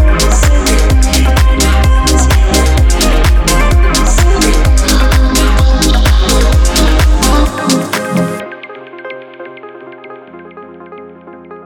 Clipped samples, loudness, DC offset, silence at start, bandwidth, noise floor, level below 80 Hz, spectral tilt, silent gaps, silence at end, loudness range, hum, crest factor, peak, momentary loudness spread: under 0.1%; -10 LUFS; under 0.1%; 0 s; 17.5 kHz; -32 dBFS; -10 dBFS; -4.5 dB/octave; none; 0.05 s; 10 LU; none; 10 dB; 0 dBFS; 21 LU